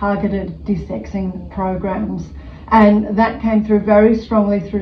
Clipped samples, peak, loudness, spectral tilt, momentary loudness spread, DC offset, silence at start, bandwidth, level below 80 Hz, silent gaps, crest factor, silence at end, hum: under 0.1%; 0 dBFS; -16 LUFS; -9 dB/octave; 13 LU; under 0.1%; 0 s; 6.2 kHz; -36 dBFS; none; 16 dB; 0 s; none